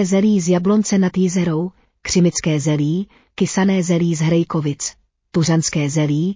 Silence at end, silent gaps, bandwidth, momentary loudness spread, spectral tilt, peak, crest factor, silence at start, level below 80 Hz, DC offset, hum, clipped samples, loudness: 0 s; none; 7.6 kHz; 9 LU; -5.5 dB/octave; -4 dBFS; 12 dB; 0 s; -50 dBFS; under 0.1%; none; under 0.1%; -18 LUFS